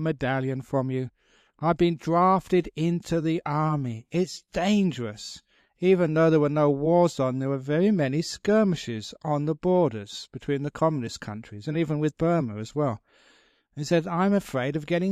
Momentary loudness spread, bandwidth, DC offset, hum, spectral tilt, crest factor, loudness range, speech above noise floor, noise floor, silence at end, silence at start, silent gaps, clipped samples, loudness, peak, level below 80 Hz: 13 LU; 13.5 kHz; under 0.1%; none; -7 dB/octave; 16 dB; 5 LU; 37 dB; -61 dBFS; 0 s; 0 s; none; under 0.1%; -25 LUFS; -10 dBFS; -56 dBFS